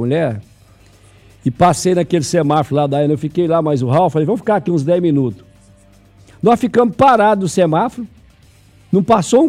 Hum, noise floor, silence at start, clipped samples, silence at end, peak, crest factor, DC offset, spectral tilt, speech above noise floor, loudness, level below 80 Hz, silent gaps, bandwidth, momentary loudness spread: none; -47 dBFS; 0 s; under 0.1%; 0 s; -2 dBFS; 14 dB; under 0.1%; -6.5 dB/octave; 33 dB; -15 LUFS; -50 dBFS; none; 14 kHz; 9 LU